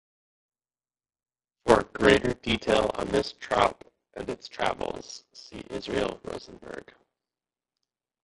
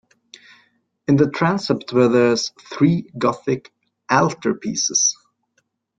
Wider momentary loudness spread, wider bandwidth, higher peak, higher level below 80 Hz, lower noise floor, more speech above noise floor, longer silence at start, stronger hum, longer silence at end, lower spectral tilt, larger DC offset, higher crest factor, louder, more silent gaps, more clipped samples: first, 21 LU vs 9 LU; first, 11.5 kHz vs 9.2 kHz; about the same, -4 dBFS vs -2 dBFS; first, -50 dBFS vs -58 dBFS; first, under -90 dBFS vs -68 dBFS; first, over 62 dB vs 50 dB; first, 1.65 s vs 1.1 s; neither; first, 1.45 s vs 0.85 s; about the same, -4.5 dB/octave vs -4.5 dB/octave; neither; first, 26 dB vs 18 dB; second, -26 LUFS vs -19 LUFS; neither; neither